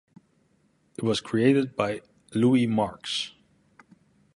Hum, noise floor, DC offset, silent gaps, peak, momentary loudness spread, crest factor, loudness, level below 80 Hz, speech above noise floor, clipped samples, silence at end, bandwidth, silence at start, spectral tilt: none; -66 dBFS; under 0.1%; none; -8 dBFS; 13 LU; 18 dB; -25 LUFS; -62 dBFS; 42 dB; under 0.1%; 1.05 s; 11.5 kHz; 1 s; -6 dB/octave